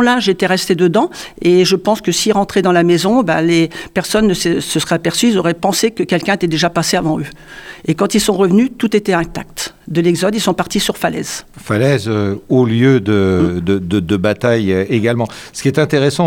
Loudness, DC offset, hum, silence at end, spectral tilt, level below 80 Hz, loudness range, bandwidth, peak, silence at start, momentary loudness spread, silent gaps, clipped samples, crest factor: -14 LUFS; under 0.1%; none; 0 s; -5 dB/octave; -42 dBFS; 3 LU; 17.5 kHz; 0 dBFS; 0 s; 8 LU; none; under 0.1%; 12 dB